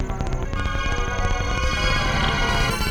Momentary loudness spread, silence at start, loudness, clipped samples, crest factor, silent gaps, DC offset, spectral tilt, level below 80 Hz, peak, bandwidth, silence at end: 6 LU; 0 s; -23 LUFS; under 0.1%; 14 dB; none; under 0.1%; -4 dB/octave; -26 dBFS; -8 dBFS; 17.5 kHz; 0 s